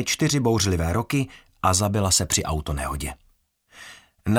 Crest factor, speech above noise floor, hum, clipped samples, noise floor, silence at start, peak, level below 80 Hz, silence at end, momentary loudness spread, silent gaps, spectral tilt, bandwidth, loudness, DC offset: 18 dB; 39 dB; none; under 0.1%; -62 dBFS; 0 s; -6 dBFS; -38 dBFS; 0 s; 14 LU; none; -4 dB/octave; 17.5 kHz; -23 LUFS; under 0.1%